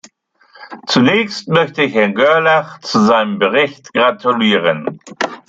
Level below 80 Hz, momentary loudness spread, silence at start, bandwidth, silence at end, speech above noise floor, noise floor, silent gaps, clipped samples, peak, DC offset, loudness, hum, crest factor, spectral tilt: -60 dBFS; 8 LU; 0.6 s; 7.8 kHz; 0.1 s; 37 dB; -50 dBFS; none; under 0.1%; -2 dBFS; under 0.1%; -14 LUFS; none; 14 dB; -5 dB/octave